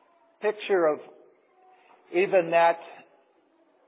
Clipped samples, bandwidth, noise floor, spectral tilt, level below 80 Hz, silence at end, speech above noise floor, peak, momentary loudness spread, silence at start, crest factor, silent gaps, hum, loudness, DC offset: under 0.1%; 4 kHz; -64 dBFS; -8.5 dB/octave; under -90 dBFS; 0.95 s; 40 dB; -10 dBFS; 12 LU; 0.4 s; 18 dB; none; none; -25 LUFS; under 0.1%